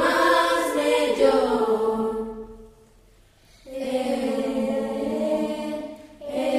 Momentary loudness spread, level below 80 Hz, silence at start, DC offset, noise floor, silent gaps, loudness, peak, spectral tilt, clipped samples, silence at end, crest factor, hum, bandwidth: 16 LU; -52 dBFS; 0 s; under 0.1%; -55 dBFS; none; -23 LUFS; -8 dBFS; -4 dB/octave; under 0.1%; 0 s; 16 dB; none; 15.5 kHz